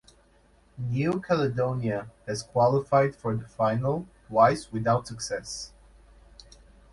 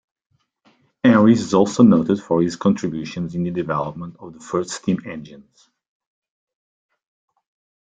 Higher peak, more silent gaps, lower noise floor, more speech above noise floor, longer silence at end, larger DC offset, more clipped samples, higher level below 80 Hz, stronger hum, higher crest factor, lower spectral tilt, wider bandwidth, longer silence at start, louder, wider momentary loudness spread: second, -8 dBFS vs -2 dBFS; neither; about the same, -60 dBFS vs -60 dBFS; second, 34 dB vs 42 dB; second, 1.25 s vs 2.45 s; neither; neither; about the same, -56 dBFS vs -58 dBFS; neither; about the same, 20 dB vs 18 dB; about the same, -6 dB/octave vs -6.5 dB/octave; first, 11.5 kHz vs 9.2 kHz; second, 0.75 s vs 1.05 s; second, -27 LUFS vs -19 LUFS; second, 13 LU vs 18 LU